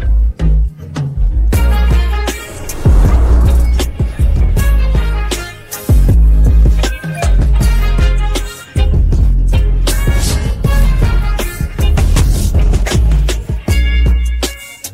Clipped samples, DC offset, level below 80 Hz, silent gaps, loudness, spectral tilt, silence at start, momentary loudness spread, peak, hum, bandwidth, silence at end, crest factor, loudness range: under 0.1%; under 0.1%; -12 dBFS; none; -14 LUFS; -5.5 dB/octave; 0 s; 9 LU; -2 dBFS; none; 16 kHz; 0 s; 10 dB; 1 LU